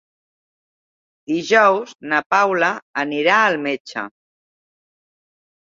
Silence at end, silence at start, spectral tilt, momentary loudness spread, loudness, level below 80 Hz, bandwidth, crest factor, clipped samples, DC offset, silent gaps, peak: 1.6 s; 1.3 s; -4 dB/octave; 12 LU; -18 LUFS; -72 dBFS; 7.8 kHz; 20 dB; under 0.1%; under 0.1%; 2.26-2.30 s, 2.82-2.94 s, 3.80-3.85 s; -2 dBFS